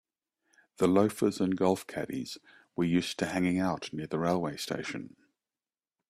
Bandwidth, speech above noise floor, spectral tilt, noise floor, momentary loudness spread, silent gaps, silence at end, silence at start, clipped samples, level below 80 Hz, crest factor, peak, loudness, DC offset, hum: 15 kHz; over 60 dB; -6 dB/octave; under -90 dBFS; 14 LU; none; 1 s; 0.8 s; under 0.1%; -66 dBFS; 20 dB; -12 dBFS; -30 LUFS; under 0.1%; none